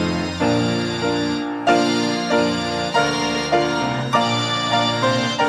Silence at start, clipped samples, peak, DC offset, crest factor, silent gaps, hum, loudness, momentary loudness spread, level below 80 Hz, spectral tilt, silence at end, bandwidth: 0 s; under 0.1%; -4 dBFS; under 0.1%; 16 dB; none; none; -19 LUFS; 4 LU; -48 dBFS; -4.5 dB/octave; 0 s; 13.5 kHz